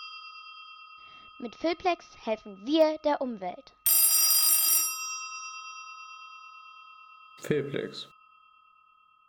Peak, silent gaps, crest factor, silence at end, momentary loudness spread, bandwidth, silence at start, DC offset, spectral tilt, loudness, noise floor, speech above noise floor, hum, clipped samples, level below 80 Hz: -10 dBFS; none; 22 dB; 1.25 s; 26 LU; over 20 kHz; 0 s; under 0.1%; -1.5 dB/octave; -25 LUFS; -62 dBFS; 32 dB; none; under 0.1%; -70 dBFS